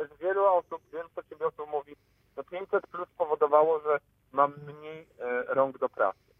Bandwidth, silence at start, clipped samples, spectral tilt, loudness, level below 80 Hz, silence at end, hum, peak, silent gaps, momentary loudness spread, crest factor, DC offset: 3.8 kHz; 0 s; under 0.1%; -8 dB/octave; -29 LUFS; -74 dBFS; 0.25 s; none; -8 dBFS; none; 19 LU; 20 dB; under 0.1%